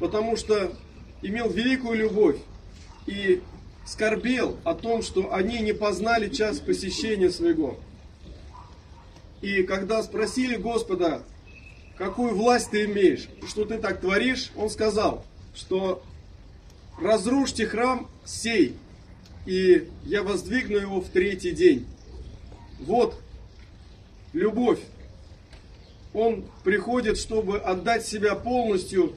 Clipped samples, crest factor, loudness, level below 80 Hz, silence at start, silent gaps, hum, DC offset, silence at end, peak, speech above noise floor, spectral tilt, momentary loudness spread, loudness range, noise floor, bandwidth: under 0.1%; 20 dB; -25 LUFS; -46 dBFS; 0 s; none; none; under 0.1%; 0 s; -6 dBFS; 23 dB; -5 dB/octave; 17 LU; 4 LU; -48 dBFS; 12.5 kHz